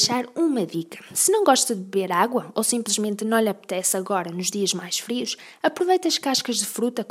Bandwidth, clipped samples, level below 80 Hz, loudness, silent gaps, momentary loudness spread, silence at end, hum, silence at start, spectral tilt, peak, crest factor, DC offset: 16 kHz; under 0.1%; -78 dBFS; -23 LUFS; none; 7 LU; 0.05 s; none; 0 s; -2.5 dB/octave; -4 dBFS; 20 dB; under 0.1%